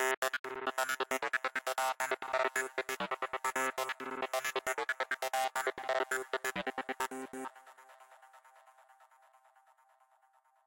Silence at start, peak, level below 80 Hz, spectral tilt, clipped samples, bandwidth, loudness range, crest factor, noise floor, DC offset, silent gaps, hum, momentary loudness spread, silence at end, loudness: 0 s; -18 dBFS; -78 dBFS; -1.5 dB/octave; under 0.1%; 17 kHz; 10 LU; 20 dB; -70 dBFS; under 0.1%; 0.17-0.22 s, 0.39-0.44 s; none; 5 LU; 1.6 s; -36 LUFS